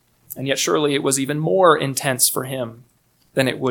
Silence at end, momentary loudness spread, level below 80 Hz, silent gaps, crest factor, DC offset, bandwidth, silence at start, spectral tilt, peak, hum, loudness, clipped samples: 0 s; 13 LU; -64 dBFS; none; 20 dB; under 0.1%; 19 kHz; 0.3 s; -3.5 dB/octave; 0 dBFS; none; -19 LUFS; under 0.1%